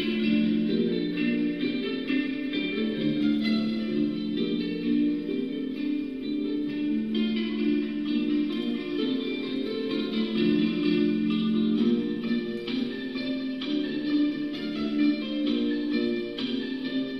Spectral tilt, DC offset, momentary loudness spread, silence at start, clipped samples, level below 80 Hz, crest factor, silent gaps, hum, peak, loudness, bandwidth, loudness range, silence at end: -7.5 dB/octave; 0.2%; 6 LU; 0 s; under 0.1%; -60 dBFS; 14 dB; none; none; -12 dBFS; -27 LUFS; 6 kHz; 2 LU; 0 s